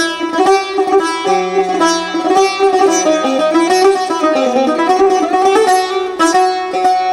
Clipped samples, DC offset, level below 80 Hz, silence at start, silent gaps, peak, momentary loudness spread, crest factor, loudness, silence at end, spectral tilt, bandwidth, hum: under 0.1%; under 0.1%; -52 dBFS; 0 s; none; -2 dBFS; 4 LU; 10 dB; -12 LUFS; 0 s; -2.5 dB/octave; 14.5 kHz; none